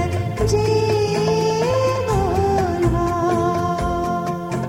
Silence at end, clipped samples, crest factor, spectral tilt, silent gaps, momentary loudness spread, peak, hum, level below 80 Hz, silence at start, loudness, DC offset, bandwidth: 0 s; under 0.1%; 12 dB; -6.5 dB/octave; none; 4 LU; -6 dBFS; none; -34 dBFS; 0 s; -19 LUFS; under 0.1%; 16.5 kHz